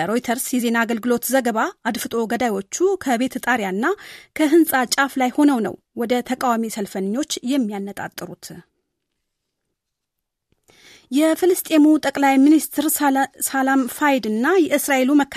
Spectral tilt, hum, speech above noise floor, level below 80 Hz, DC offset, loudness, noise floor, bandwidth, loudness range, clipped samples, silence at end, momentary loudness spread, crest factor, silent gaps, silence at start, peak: -3.5 dB/octave; none; 61 dB; -62 dBFS; under 0.1%; -19 LUFS; -80 dBFS; 15 kHz; 10 LU; under 0.1%; 0 s; 10 LU; 16 dB; none; 0 s; -4 dBFS